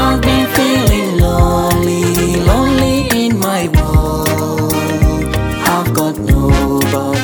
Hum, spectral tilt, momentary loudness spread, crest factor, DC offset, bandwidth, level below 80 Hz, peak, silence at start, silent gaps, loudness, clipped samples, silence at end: none; -5.5 dB/octave; 4 LU; 12 dB; under 0.1%; 19.5 kHz; -20 dBFS; 0 dBFS; 0 s; none; -13 LUFS; under 0.1%; 0 s